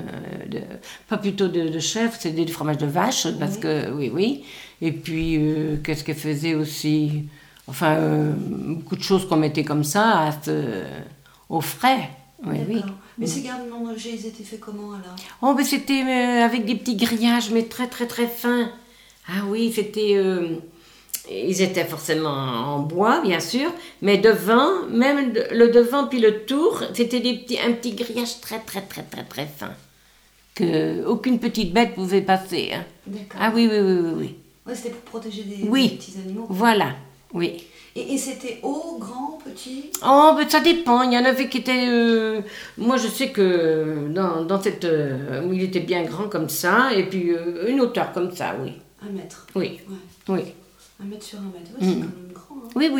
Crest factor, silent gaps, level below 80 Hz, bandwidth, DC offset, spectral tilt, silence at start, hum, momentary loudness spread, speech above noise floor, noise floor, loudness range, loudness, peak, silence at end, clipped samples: 18 dB; none; -54 dBFS; over 20 kHz; under 0.1%; -5 dB/octave; 0 s; none; 17 LU; 34 dB; -55 dBFS; 8 LU; -22 LUFS; -4 dBFS; 0 s; under 0.1%